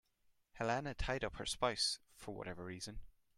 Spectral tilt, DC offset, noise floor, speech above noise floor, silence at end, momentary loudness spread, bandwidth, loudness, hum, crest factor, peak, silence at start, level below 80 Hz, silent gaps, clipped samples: -3 dB/octave; under 0.1%; -76 dBFS; 35 dB; 0.25 s; 13 LU; 15 kHz; -41 LUFS; none; 22 dB; -20 dBFS; 0.55 s; -54 dBFS; none; under 0.1%